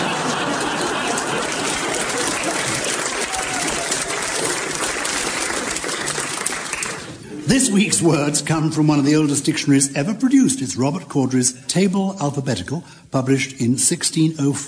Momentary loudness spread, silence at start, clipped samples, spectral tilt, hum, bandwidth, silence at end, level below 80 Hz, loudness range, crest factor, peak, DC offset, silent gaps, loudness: 7 LU; 0 s; under 0.1%; -3.5 dB/octave; none; 10.5 kHz; 0 s; -50 dBFS; 4 LU; 20 dB; 0 dBFS; under 0.1%; none; -19 LUFS